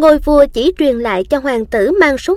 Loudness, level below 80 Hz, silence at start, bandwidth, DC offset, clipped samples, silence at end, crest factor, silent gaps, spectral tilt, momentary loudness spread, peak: -13 LUFS; -30 dBFS; 0 s; 14.5 kHz; under 0.1%; under 0.1%; 0 s; 12 dB; none; -5 dB/octave; 6 LU; 0 dBFS